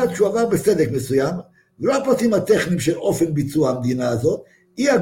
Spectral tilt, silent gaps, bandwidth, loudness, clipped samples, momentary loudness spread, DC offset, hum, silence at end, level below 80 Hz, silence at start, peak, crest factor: -6 dB/octave; none; 17 kHz; -20 LUFS; under 0.1%; 6 LU; under 0.1%; none; 0 s; -52 dBFS; 0 s; -4 dBFS; 14 dB